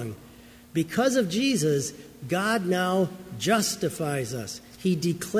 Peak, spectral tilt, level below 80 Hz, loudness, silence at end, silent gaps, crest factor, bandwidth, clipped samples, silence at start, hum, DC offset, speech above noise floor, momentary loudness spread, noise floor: -10 dBFS; -4.5 dB/octave; -60 dBFS; -26 LUFS; 0 s; none; 18 dB; 16 kHz; under 0.1%; 0 s; none; under 0.1%; 24 dB; 11 LU; -49 dBFS